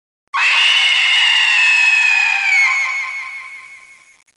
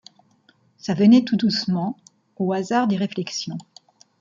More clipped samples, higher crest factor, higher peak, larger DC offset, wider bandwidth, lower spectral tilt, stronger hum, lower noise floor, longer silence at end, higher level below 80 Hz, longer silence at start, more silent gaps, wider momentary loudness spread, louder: neither; second, 12 dB vs 18 dB; about the same, -4 dBFS vs -4 dBFS; neither; first, 11.5 kHz vs 7.6 kHz; second, 5.5 dB/octave vs -6 dB/octave; neither; second, -43 dBFS vs -60 dBFS; about the same, 0.6 s vs 0.6 s; second, -74 dBFS vs -68 dBFS; second, 0.35 s vs 0.85 s; neither; about the same, 15 LU vs 17 LU; first, -11 LUFS vs -21 LUFS